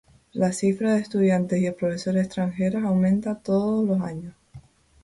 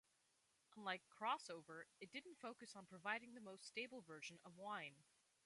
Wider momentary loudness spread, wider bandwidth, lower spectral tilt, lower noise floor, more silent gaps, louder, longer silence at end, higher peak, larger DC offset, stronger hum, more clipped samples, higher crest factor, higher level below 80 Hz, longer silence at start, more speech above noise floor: second, 6 LU vs 12 LU; about the same, 11.5 kHz vs 11.5 kHz; first, -7 dB/octave vs -3 dB/octave; second, -49 dBFS vs -83 dBFS; neither; first, -24 LUFS vs -52 LUFS; about the same, 0.45 s vs 0.45 s; first, -12 dBFS vs -30 dBFS; neither; neither; neither; second, 12 dB vs 24 dB; first, -56 dBFS vs under -90 dBFS; second, 0.35 s vs 0.7 s; second, 26 dB vs 30 dB